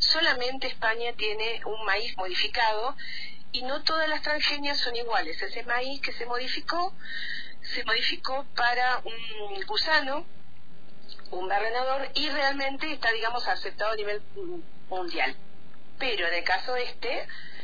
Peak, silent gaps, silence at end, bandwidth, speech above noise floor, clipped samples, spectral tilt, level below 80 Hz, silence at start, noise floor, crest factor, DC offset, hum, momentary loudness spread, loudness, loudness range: -8 dBFS; none; 0 s; 5 kHz; 26 dB; under 0.1%; -3 dB/octave; -54 dBFS; 0 s; -56 dBFS; 20 dB; 4%; none; 12 LU; -28 LUFS; 3 LU